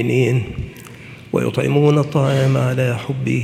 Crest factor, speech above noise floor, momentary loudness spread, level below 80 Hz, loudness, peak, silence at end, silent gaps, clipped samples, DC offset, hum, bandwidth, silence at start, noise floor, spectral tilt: 16 dB; 21 dB; 17 LU; -44 dBFS; -18 LUFS; -2 dBFS; 0 s; none; under 0.1%; under 0.1%; none; 14 kHz; 0 s; -37 dBFS; -7.5 dB/octave